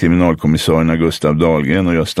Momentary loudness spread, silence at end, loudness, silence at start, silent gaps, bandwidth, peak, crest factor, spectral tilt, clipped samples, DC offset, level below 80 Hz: 2 LU; 0 s; -14 LUFS; 0 s; none; 14.5 kHz; 0 dBFS; 14 dB; -6.5 dB/octave; under 0.1%; under 0.1%; -34 dBFS